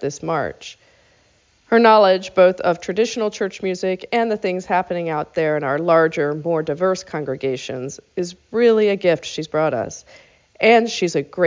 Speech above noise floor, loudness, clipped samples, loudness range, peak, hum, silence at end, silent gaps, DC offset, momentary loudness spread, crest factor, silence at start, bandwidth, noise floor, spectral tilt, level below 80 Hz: 39 dB; -19 LUFS; under 0.1%; 4 LU; -2 dBFS; none; 0 s; none; under 0.1%; 13 LU; 18 dB; 0 s; 7.6 kHz; -58 dBFS; -5 dB/octave; -58 dBFS